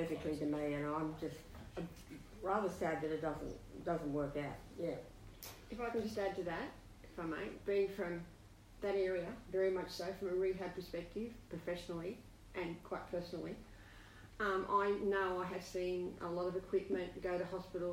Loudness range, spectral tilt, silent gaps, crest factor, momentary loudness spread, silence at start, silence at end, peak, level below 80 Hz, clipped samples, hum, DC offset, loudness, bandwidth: 5 LU; -6 dB/octave; none; 18 dB; 15 LU; 0 s; 0 s; -24 dBFS; -60 dBFS; under 0.1%; none; under 0.1%; -41 LUFS; 16 kHz